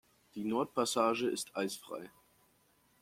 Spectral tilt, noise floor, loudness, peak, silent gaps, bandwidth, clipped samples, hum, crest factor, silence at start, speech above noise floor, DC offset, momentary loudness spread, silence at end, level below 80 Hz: -3.5 dB/octave; -71 dBFS; -35 LUFS; -16 dBFS; none; 16.5 kHz; under 0.1%; none; 20 dB; 0.35 s; 36 dB; under 0.1%; 16 LU; 0.9 s; -80 dBFS